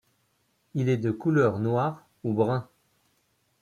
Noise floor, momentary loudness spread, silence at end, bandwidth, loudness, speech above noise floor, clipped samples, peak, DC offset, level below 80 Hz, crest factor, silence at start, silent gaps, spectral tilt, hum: -71 dBFS; 9 LU; 1 s; 9.6 kHz; -27 LUFS; 46 dB; under 0.1%; -10 dBFS; under 0.1%; -66 dBFS; 18 dB; 0.75 s; none; -8.5 dB/octave; none